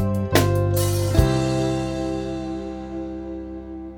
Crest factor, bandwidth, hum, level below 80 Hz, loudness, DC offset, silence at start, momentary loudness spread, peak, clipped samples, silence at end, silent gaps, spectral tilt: 20 dB; over 20 kHz; none; -34 dBFS; -23 LUFS; under 0.1%; 0 s; 13 LU; -2 dBFS; under 0.1%; 0 s; none; -6 dB/octave